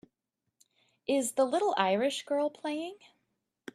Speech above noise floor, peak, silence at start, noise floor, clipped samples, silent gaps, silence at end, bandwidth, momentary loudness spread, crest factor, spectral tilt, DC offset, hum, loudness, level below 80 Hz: 55 dB; -10 dBFS; 1.1 s; -85 dBFS; under 0.1%; none; 0.8 s; 14.5 kHz; 14 LU; 22 dB; -3.5 dB/octave; under 0.1%; none; -30 LUFS; -82 dBFS